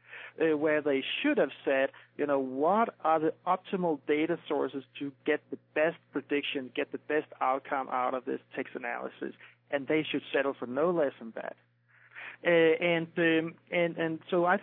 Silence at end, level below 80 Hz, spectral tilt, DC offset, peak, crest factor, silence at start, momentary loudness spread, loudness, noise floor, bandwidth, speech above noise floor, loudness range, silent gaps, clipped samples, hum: 0 s; under -90 dBFS; -9 dB/octave; under 0.1%; -14 dBFS; 18 dB; 0.1 s; 11 LU; -30 LUFS; -57 dBFS; 4.1 kHz; 27 dB; 4 LU; none; under 0.1%; none